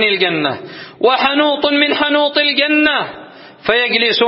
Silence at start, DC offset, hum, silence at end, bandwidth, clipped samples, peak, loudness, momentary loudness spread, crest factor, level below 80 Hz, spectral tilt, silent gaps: 0 s; under 0.1%; none; 0 s; 5.8 kHz; under 0.1%; 0 dBFS; -13 LUFS; 10 LU; 14 dB; -56 dBFS; -7 dB/octave; none